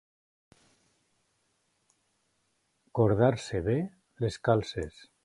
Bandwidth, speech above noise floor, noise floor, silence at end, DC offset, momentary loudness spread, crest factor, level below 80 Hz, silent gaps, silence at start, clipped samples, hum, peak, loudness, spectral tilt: 11.5 kHz; 47 dB; -75 dBFS; 0.35 s; under 0.1%; 14 LU; 22 dB; -54 dBFS; none; 2.95 s; under 0.1%; none; -10 dBFS; -29 LUFS; -7 dB/octave